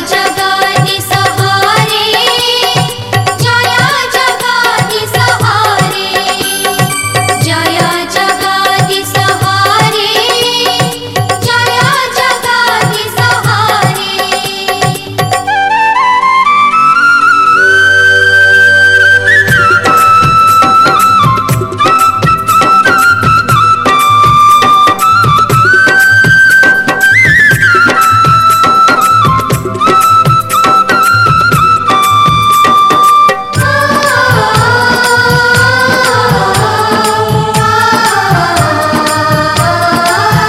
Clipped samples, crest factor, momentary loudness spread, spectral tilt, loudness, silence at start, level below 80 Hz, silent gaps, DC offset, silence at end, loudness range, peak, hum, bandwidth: 0.4%; 8 dB; 7 LU; -3.5 dB/octave; -7 LUFS; 0 s; -36 dBFS; none; under 0.1%; 0 s; 5 LU; 0 dBFS; none; 16.5 kHz